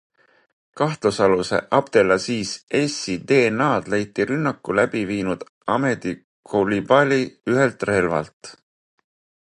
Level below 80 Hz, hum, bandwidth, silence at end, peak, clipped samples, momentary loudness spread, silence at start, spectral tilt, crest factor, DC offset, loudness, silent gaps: -54 dBFS; none; 11 kHz; 0.95 s; -2 dBFS; under 0.1%; 9 LU; 0.75 s; -5.5 dB/octave; 20 dB; under 0.1%; -21 LUFS; 2.63-2.67 s, 5.49-5.61 s, 6.24-6.43 s, 8.33-8.41 s